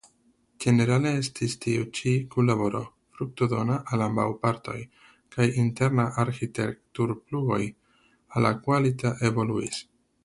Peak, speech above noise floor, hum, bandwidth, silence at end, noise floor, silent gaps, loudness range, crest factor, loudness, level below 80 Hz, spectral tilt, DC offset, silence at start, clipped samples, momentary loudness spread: -6 dBFS; 40 dB; none; 11.5 kHz; 0.4 s; -65 dBFS; none; 2 LU; 20 dB; -27 LUFS; -58 dBFS; -6.5 dB/octave; under 0.1%; 0.6 s; under 0.1%; 11 LU